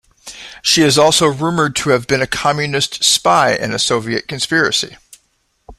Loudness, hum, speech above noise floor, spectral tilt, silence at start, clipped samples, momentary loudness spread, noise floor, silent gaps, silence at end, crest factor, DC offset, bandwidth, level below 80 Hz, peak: -14 LUFS; none; 48 dB; -3 dB/octave; 0.25 s; under 0.1%; 10 LU; -62 dBFS; none; 0.05 s; 16 dB; under 0.1%; 16 kHz; -48 dBFS; 0 dBFS